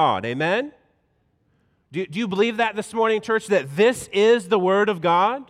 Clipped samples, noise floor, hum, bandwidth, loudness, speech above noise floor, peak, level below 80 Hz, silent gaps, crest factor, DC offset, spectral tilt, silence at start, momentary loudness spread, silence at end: under 0.1%; -66 dBFS; none; 14.5 kHz; -21 LUFS; 46 dB; -8 dBFS; -64 dBFS; none; 14 dB; under 0.1%; -5 dB/octave; 0 s; 8 LU; 0.05 s